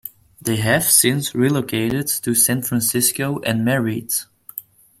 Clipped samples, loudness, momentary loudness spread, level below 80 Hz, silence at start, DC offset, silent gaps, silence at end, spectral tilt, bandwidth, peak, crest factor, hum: under 0.1%; -18 LUFS; 17 LU; -54 dBFS; 0.05 s; under 0.1%; none; 0.4 s; -3.5 dB/octave; 16.5 kHz; 0 dBFS; 20 dB; none